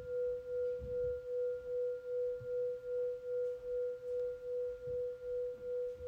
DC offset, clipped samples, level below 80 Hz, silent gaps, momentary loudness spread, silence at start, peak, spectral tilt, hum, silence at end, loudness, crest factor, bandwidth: under 0.1%; under 0.1%; -62 dBFS; none; 2 LU; 0 s; -30 dBFS; -7 dB/octave; none; 0 s; -40 LUFS; 8 dB; 5 kHz